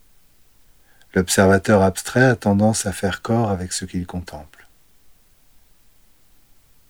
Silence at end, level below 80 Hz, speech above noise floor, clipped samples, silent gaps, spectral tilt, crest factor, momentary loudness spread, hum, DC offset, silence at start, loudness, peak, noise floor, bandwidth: 2.45 s; -52 dBFS; 37 dB; under 0.1%; none; -5 dB/octave; 20 dB; 14 LU; none; 0.2%; 1.15 s; -19 LUFS; -2 dBFS; -56 dBFS; over 20 kHz